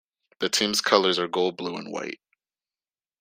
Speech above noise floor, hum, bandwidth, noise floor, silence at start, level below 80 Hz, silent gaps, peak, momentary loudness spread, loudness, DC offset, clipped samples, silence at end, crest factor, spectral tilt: over 65 dB; none; 16 kHz; under -90 dBFS; 0.4 s; -70 dBFS; none; -2 dBFS; 14 LU; -24 LUFS; under 0.1%; under 0.1%; 1.05 s; 24 dB; -2.5 dB/octave